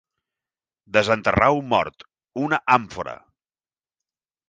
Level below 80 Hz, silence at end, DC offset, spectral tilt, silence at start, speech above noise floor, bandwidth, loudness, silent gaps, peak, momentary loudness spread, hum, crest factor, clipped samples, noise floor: -48 dBFS; 1.35 s; under 0.1%; -5.5 dB/octave; 0.95 s; over 69 dB; 9.6 kHz; -20 LUFS; none; -2 dBFS; 16 LU; none; 22 dB; under 0.1%; under -90 dBFS